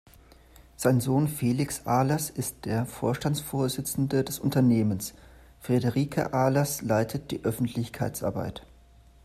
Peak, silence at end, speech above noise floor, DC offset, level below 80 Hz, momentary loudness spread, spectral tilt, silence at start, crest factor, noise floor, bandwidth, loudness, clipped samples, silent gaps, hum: -8 dBFS; 0.65 s; 28 dB; under 0.1%; -54 dBFS; 8 LU; -6 dB/octave; 0.8 s; 20 dB; -55 dBFS; 15 kHz; -27 LUFS; under 0.1%; none; none